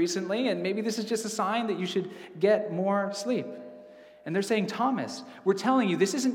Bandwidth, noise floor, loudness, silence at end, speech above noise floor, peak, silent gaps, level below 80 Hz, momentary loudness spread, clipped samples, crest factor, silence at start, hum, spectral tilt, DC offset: 17 kHz; -50 dBFS; -28 LUFS; 0 s; 22 dB; -12 dBFS; none; -82 dBFS; 9 LU; under 0.1%; 16 dB; 0 s; none; -5 dB/octave; under 0.1%